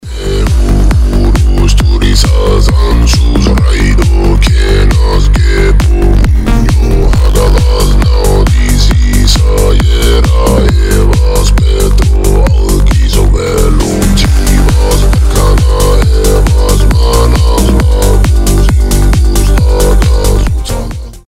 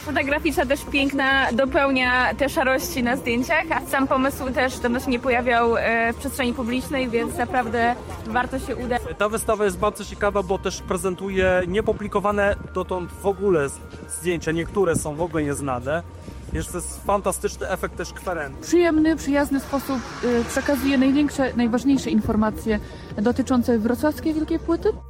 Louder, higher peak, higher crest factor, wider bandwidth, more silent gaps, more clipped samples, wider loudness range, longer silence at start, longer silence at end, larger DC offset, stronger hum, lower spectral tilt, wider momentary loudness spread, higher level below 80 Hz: first, -9 LUFS vs -22 LUFS; first, 0 dBFS vs -6 dBFS; second, 6 dB vs 16 dB; about the same, 15 kHz vs 16.5 kHz; neither; first, 0.8% vs under 0.1%; second, 1 LU vs 5 LU; about the same, 0.05 s vs 0 s; about the same, 0.1 s vs 0 s; neither; neither; about the same, -5.5 dB/octave vs -5 dB/octave; second, 1 LU vs 8 LU; first, -8 dBFS vs -40 dBFS